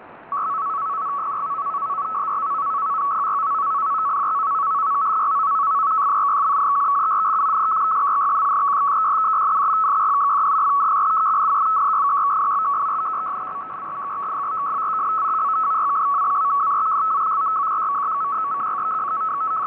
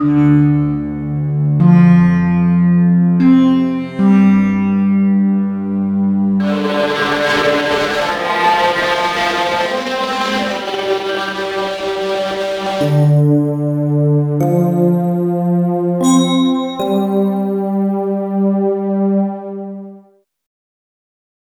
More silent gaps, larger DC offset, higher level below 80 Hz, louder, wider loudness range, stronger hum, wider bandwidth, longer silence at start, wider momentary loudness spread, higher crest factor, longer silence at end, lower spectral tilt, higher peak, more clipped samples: neither; neither; second, -70 dBFS vs -46 dBFS; second, -20 LUFS vs -14 LUFS; about the same, 5 LU vs 6 LU; neither; second, 4 kHz vs 13.5 kHz; about the same, 0 s vs 0 s; about the same, 7 LU vs 8 LU; second, 6 dB vs 14 dB; second, 0 s vs 1.45 s; about the same, -6.5 dB/octave vs -7 dB/octave; second, -14 dBFS vs 0 dBFS; neither